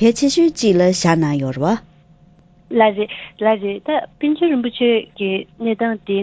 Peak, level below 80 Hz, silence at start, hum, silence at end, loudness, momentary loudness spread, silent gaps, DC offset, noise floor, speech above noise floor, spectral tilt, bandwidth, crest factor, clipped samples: 0 dBFS; -52 dBFS; 0 s; none; 0 s; -18 LUFS; 8 LU; none; under 0.1%; -49 dBFS; 33 dB; -5.5 dB/octave; 8 kHz; 16 dB; under 0.1%